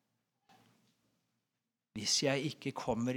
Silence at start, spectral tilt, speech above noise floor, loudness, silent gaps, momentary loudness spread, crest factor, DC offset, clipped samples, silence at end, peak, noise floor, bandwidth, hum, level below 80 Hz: 1.95 s; -3.5 dB/octave; 54 dB; -34 LUFS; none; 10 LU; 22 dB; under 0.1%; under 0.1%; 0 s; -18 dBFS; -89 dBFS; 18.5 kHz; none; -70 dBFS